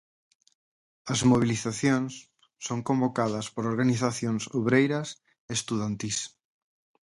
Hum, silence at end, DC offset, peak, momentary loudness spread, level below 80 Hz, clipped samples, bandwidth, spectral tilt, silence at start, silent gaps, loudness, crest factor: none; 0.75 s; under 0.1%; -10 dBFS; 15 LU; -60 dBFS; under 0.1%; 11.5 kHz; -5 dB/octave; 1.05 s; 5.39-5.48 s; -27 LUFS; 18 dB